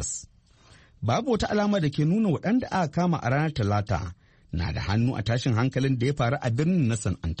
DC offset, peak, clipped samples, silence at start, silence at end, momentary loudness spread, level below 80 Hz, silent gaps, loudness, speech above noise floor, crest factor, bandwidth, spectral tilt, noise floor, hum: under 0.1%; -12 dBFS; under 0.1%; 0 s; 0 s; 7 LU; -44 dBFS; none; -26 LUFS; 31 dB; 14 dB; 8.8 kHz; -6 dB/octave; -56 dBFS; none